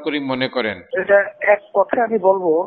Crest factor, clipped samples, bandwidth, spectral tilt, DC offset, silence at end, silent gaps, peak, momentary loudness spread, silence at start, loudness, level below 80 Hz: 16 dB; under 0.1%; 4.6 kHz; -8 dB/octave; under 0.1%; 0 s; none; -2 dBFS; 7 LU; 0 s; -18 LUFS; -64 dBFS